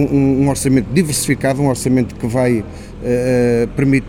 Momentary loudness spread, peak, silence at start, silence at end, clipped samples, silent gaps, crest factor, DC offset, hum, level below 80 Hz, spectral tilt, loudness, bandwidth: 6 LU; -2 dBFS; 0 s; 0 s; under 0.1%; none; 14 dB; under 0.1%; none; -34 dBFS; -6 dB/octave; -15 LUFS; 16.5 kHz